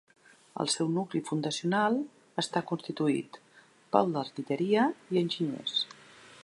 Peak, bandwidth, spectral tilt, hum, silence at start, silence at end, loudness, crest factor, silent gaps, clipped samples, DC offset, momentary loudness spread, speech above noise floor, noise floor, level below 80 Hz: -8 dBFS; 11.5 kHz; -4.5 dB/octave; none; 0.55 s; 0 s; -30 LUFS; 22 dB; none; under 0.1%; under 0.1%; 8 LU; 30 dB; -60 dBFS; -80 dBFS